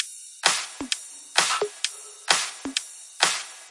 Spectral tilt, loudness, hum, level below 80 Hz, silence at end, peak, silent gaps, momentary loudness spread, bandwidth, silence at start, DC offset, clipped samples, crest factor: 1 dB/octave; -25 LUFS; none; -68 dBFS; 0 s; -2 dBFS; none; 8 LU; 11.5 kHz; 0 s; under 0.1%; under 0.1%; 26 dB